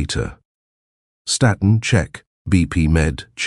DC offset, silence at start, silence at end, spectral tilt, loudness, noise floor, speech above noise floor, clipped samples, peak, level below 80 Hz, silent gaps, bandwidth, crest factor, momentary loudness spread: under 0.1%; 0 s; 0 s; -5 dB/octave; -18 LUFS; under -90 dBFS; over 73 dB; under 0.1%; -2 dBFS; -30 dBFS; 0.45-1.25 s, 2.27-2.45 s; 12 kHz; 18 dB; 14 LU